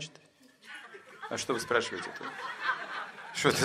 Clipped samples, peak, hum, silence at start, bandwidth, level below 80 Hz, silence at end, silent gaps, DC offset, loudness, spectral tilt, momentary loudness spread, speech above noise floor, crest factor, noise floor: under 0.1%; -8 dBFS; none; 0 s; 15 kHz; -72 dBFS; 0 s; none; under 0.1%; -33 LUFS; -3 dB/octave; 17 LU; 26 dB; 26 dB; -60 dBFS